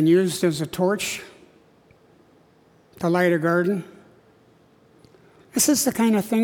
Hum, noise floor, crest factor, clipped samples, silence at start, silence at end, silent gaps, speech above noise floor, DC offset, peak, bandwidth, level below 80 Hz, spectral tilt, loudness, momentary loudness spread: none; -56 dBFS; 18 dB; under 0.1%; 0 s; 0 s; none; 36 dB; under 0.1%; -6 dBFS; 19 kHz; -64 dBFS; -4.5 dB/octave; -22 LUFS; 10 LU